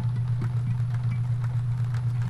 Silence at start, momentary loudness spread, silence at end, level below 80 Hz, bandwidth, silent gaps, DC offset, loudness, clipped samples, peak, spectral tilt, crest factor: 0 s; 0 LU; 0 s; -46 dBFS; 5 kHz; none; under 0.1%; -27 LUFS; under 0.1%; -16 dBFS; -8.5 dB/octave; 8 dB